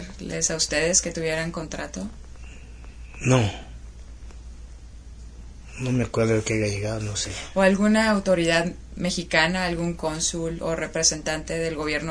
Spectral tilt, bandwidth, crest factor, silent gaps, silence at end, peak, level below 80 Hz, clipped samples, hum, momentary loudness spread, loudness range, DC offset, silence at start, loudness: -4 dB/octave; 11 kHz; 22 dB; none; 0 s; -4 dBFS; -42 dBFS; under 0.1%; none; 24 LU; 7 LU; under 0.1%; 0 s; -24 LUFS